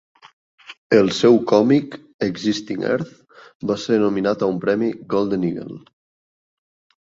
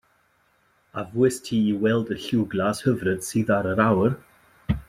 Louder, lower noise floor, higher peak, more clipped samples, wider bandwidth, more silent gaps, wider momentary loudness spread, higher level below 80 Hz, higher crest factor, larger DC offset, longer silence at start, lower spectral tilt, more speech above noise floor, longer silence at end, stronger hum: first, -19 LUFS vs -23 LUFS; first, under -90 dBFS vs -64 dBFS; about the same, -2 dBFS vs -4 dBFS; neither; second, 7.8 kHz vs 15.5 kHz; first, 0.78-0.90 s, 2.14-2.19 s, 3.55-3.60 s vs none; first, 15 LU vs 12 LU; second, -60 dBFS vs -48 dBFS; about the same, 18 dB vs 20 dB; neither; second, 0.7 s vs 0.95 s; about the same, -6 dB/octave vs -6 dB/octave; first, over 71 dB vs 42 dB; first, 1.35 s vs 0.1 s; neither